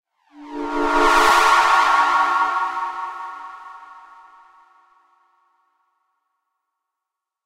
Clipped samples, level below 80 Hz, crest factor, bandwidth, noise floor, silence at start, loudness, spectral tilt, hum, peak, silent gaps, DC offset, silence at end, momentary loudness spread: under 0.1%; -44 dBFS; 20 dB; 16 kHz; -84 dBFS; 0.35 s; -17 LUFS; -1 dB/octave; none; -2 dBFS; none; under 0.1%; 3.45 s; 22 LU